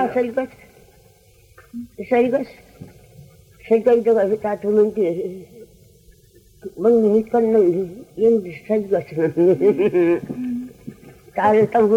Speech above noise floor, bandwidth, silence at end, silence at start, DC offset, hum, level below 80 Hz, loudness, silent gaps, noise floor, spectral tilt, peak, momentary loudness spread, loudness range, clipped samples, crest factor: 34 dB; 11.5 kHz; 0 s; 0 s; under 0.1%; none; -56 dBFS; -19 LUFS; none; -52 dBFS; -8 dB/octave; -4 dBFS; 19 LU; 6 LU; under 0.1%; 14 dB